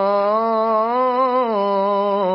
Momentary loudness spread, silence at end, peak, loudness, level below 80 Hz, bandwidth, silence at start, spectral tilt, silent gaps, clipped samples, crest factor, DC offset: 1 LU; 0 s; -8 dBFS; -18 LUFS; -70 dBFS; 5.6 kHz; 0 s; -11 dB/octave; none; under 0.1%; 10 dB; under 0.1%